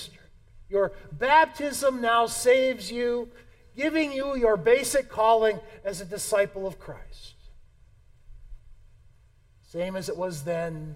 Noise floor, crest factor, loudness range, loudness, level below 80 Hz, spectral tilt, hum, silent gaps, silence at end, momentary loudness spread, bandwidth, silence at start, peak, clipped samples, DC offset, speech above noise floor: -58 dBFS; 20 dB; 14 LU; -25 LUFS; -50 dBFS; -3.5 dB/octave; none; none; 0 s; 15 LU; 16 kHz; 0 s; -6 dBFS; under 0.1%; under 0.1%; 32 dB